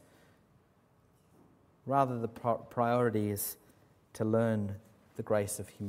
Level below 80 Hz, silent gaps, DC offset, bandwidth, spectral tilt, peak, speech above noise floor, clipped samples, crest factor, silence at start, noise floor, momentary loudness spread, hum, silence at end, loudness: -70 dBFS; none; under 0.1%; 16 kHz; -6.5 dB/octave; -14 dBFS; 35 dB; under 0.1%; 22 dB; 1.85 s; -67 dBFS; 19 LU; none; 0 s; -33 LUFS